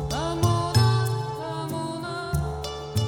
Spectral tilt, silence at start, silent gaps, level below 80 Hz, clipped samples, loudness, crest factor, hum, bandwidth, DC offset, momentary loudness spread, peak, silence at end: -5.5 dB/octave; 0 s; none; -40 dBFS; under 0.1%; -26 LUFS; 18 dB; none; 17.5 kHz; under 0.1%; 10 LU; -8 dBFS; 0 s